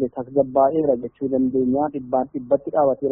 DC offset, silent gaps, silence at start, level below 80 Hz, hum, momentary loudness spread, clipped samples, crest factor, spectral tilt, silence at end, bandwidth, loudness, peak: under 0.1%; none; 0 s; -56 dBFS; none; 6 LU; under 0.1%; 16 dB; -6.5 dB/octave; 0 s; 3.1 kHz; -21 LUFS; -4 dBFS